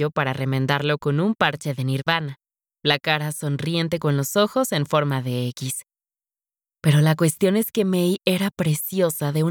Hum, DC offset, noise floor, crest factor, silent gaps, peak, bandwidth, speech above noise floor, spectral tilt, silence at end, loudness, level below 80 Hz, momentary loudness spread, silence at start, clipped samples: none; under 0.1%; under -90 dBFS; 18 dB; none; -4 dBFS; 20 kHz; over 69 dB; -5.5 dB/octave; 0 s; -22 LUFS; -62 dBFS; 7 LU; 0 s; under 0.1%